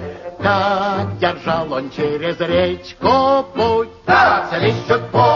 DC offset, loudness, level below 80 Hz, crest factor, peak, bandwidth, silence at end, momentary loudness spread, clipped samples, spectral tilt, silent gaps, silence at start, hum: under 0.1%; -17 LUFS; -48 dBFS; 14 dB; -2 dBFS; 7.2 kHz; 0 s; 8 LU; under 0.1%; -6.5 dB/octave; none; 0 s; none